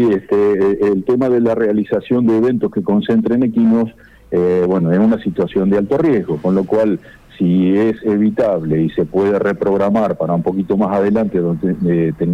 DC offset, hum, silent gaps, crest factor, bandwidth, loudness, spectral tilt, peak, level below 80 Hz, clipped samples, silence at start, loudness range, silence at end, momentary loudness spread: under 0.1%; none; none; 8 dB; 6.6 kHz; -15 LUFS; -9.5 dB/octave; -6 dBFS; -46 dBFS; under 0.1%; 0 s; 1 LU; 0 s; 4 LU